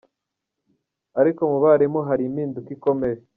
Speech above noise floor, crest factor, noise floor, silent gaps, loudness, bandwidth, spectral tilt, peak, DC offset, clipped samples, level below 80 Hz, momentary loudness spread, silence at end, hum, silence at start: 62 dB; 18 dB; -82 dBFS; none; -21 LUFS; 3.8 kHz; -9.5 dB/octave; -4 dBFS; under 0.1%; under 0.1%; -62 dBFS; 11 LU; 0.2 s; none; 1.15 s